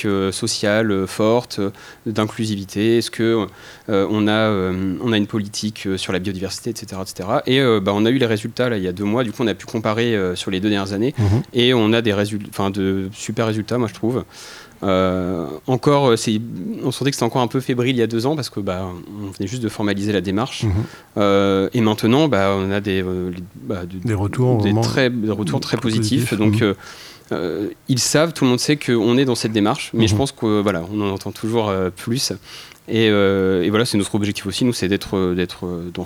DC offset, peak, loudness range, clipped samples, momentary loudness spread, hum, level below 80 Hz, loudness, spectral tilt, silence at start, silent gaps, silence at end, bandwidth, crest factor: under 0.1%; -2 dBFS; 3 LU; under 0.1%; 10 LU; none; -54 dBFS; -19 LUFS; -5.5 dB/octave; 0 s; none; 0 s; over 20 kHz; 18 dB